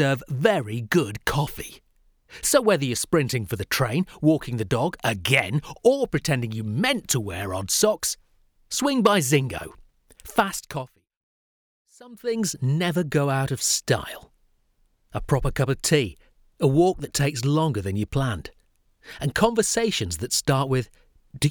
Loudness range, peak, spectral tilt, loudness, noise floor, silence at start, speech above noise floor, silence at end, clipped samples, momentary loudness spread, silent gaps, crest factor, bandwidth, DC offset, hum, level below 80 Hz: 3 LU; -4 dBFS; -4.5 dB/octave; -23 LUFS; -65 dBFS; 0 s; 42 dB; 0 s; under 0.1%; 11 LU; 11.17-11.85 s; 20 dB; over 20 kHz; under 0.1%; none; -46 dBFS